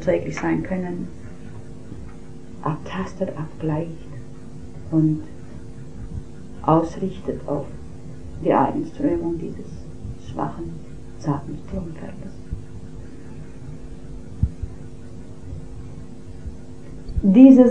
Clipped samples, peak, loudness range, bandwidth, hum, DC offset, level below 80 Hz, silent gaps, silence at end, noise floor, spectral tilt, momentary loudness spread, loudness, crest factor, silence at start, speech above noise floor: under 0.1%; 0 dBFS; 10 LU; 8.8 kHz; none; 2%; -38 dBFS; none; 0 s; -39 dBFS; -8.5 dB/octave; 20 LU; -22 LUFS; 24 dB; 0 s; 20 dB